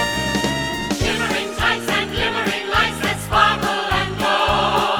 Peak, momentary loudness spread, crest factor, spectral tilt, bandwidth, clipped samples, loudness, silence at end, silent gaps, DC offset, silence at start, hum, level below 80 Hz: -2 dBFS; 5 LU; 18 dB; -3.5 dB/octave; over 20 kHz; under 0.1%; -19 LUFS; 0 s; none; 0.2%; 0 s; none; -36 dBFS